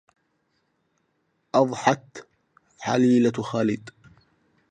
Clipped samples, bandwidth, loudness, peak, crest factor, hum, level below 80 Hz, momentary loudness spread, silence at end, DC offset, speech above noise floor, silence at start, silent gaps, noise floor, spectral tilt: under 0.1%; 9.2 kHz; -23 LUFS; -4 dBFS; 24 dB; none; -68 dBFS; 15 LU; 0.8 s; under 0.1%; 50 dB; 1.55 s; none; -72 dBFS; -6 dB/octave